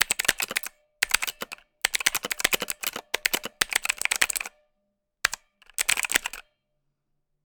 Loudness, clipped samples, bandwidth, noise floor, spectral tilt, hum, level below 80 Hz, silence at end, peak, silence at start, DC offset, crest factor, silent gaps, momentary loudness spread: -26 LUFS; under 0.1%; over 20 kHz; -77 dBFS; 1.5 dB/octave; none; -56 dBFS; 1.05 s; -4 dBFS; 0 s; under 0.1%; 26 dB; none; 13 LU